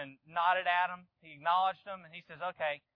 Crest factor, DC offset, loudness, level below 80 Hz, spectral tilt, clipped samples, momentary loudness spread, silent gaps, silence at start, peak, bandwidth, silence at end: 18 dB; under 0.1%; -33 LUFS; -84 dBFS; -5.5 dB/octave; under 0.1%; 16 LU; none; 0 s; -16 dBFS; 5.2 kHz; 0.2 s